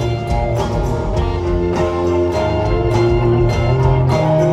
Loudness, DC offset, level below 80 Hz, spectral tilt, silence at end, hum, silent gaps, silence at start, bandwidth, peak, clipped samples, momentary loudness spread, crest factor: -16 LUFS; under 0.1%; -24 dBFS; -8 dB/octave; 0 s; none; none; 0 s; 12 kHz; -2 dBFS; under 0.1%; 5 LU; 14 dB